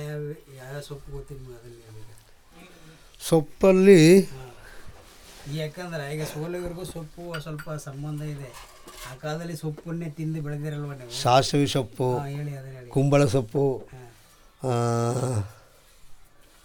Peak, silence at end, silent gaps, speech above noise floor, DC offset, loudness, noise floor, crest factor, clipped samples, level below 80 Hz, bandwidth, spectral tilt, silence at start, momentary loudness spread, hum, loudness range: -4 dBFS; 0.5 s; none; 29 dB; under 0.1%; -24 LUFS; -54 dBFS; 22 dB; under 0.1%; -52 dBFS; 19.5 kHz; -6 dB/octave; 0 s; 21 LU; none; 14 LU